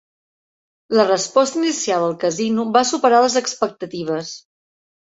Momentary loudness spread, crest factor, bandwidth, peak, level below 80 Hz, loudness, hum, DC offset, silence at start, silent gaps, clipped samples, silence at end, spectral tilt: 10 LU; 18 dB; 8 kHz; -2 dBFS; -66 dBFS; -18 LUFS; none; under 0.1%; 0.9 s; none; under 0.1%; 0.7 s; -3.5 dB/octave